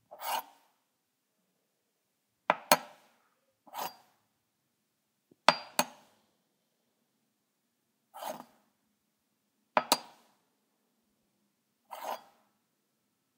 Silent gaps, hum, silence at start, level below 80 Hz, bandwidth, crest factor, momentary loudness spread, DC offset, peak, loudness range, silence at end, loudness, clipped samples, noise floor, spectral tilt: none; none; 0.1 s; -88 dBFS; 16 kHz; 38 dB; 17 LU; under 0.1%; 0 dBFS; 15 LU; 1.2 s; -32 LUFS; under 0.1%; -81 dBFS; -1 dB/octave